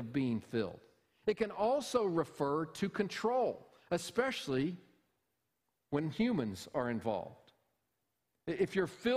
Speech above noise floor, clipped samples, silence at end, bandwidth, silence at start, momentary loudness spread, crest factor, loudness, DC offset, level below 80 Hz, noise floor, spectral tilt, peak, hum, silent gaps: 50 dB; under 0.1%; 0 s; 15.5 kHz; 0 s; 7 LU; 18 dB; -36 LUFS; under 0.1%; -68 dBFS; -85 dBFS; -5.5 dB/octave; -20 dBFS; none; none